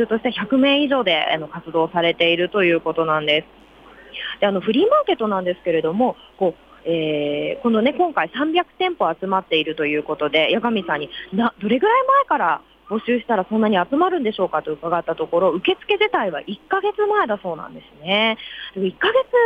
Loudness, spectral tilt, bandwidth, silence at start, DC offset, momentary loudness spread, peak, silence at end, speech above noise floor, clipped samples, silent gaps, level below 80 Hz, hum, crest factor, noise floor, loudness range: -20 LUFS; -7 dB/octave; 5.8 kHz; 0 s; under 0.1%; 9 LU; -4 dBFS; 0 s; 24 dB; under 0.1%; none; -58 dBFS; none; 14 dB; -44 dBFS; 2 LU